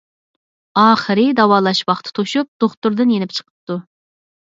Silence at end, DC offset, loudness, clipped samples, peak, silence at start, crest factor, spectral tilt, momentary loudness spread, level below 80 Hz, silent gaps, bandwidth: 0.7 s; under 0.1%; -16 LUFS; under 0.1%; 0 dBFS; 0.75 s; 18 dB; -5.5 dB/octave; 14 LU; -64 dBFS; 2.48-2.60 s, 2.77-2.82 s, 3.50-3.67 s; 7.8 kHz